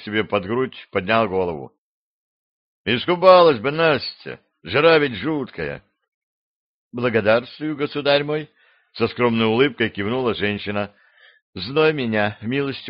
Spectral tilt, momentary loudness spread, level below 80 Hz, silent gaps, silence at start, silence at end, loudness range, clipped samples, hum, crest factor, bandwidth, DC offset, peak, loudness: -3.5 dB/octave; 15 LU; -58 dBFS; 1.78-2.85 s, 6.08-6.91 s, 11.42-11.53 s; 0 s; 0 s; 6 LU; under 0.1%; none; 20 dB; 5.6 kHz; under 0.1%; 0 dBFS; -20 LUFS